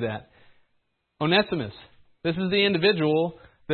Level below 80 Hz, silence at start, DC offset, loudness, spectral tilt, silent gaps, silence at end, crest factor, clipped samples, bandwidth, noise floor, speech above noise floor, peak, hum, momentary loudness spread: -60 dBFS; 0 s; under 0.1%; -24 LUFS; -10 dB/octave; none; 0 s; 18 dB; under 0.1%; 4.5 kHz; -72 dBFS; 48 dB; -8 dBFS; none; 11 LU